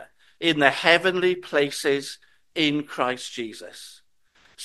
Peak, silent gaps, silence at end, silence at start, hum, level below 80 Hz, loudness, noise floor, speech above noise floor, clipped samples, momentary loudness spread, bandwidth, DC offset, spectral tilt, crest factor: 0 dBFS; none; 0 s; 0 s; none; -68 dBFS; -22 LUFS; -61 dBFS; 38 dB; under 0.1%; 20 LU; 12.5 kHz; under 0.1%; -3.5 dB/octave; 24 dB